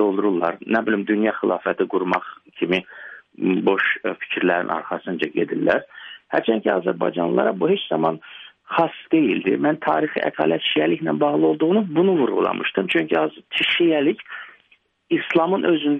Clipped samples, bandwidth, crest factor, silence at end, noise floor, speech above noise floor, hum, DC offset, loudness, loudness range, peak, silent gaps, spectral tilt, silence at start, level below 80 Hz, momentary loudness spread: under 0.1%; 5.6 kHz; 16 dB; 0 s; -60 dBFS; 40 dB; none; under 0.1%; -21 LUFS; 3 LU; -4 dBFS; none; -7.5 dB/octave; 0 s; -66 dBFS; 7 LU